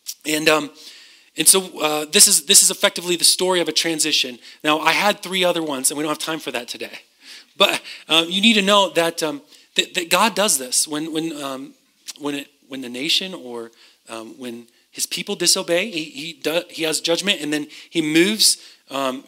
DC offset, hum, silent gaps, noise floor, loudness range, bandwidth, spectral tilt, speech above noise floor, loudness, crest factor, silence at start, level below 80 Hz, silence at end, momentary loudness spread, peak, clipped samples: under 0.1%; none; none; -44 dBFS; 10 LU; 16.5 kHz; -1.5 dB/octave; 25 dB; -17 LUFS; 20 dB; 0.05 s; -70 dBFS; 0.05 s; 20 LU; 0 dBFS; under 0.1%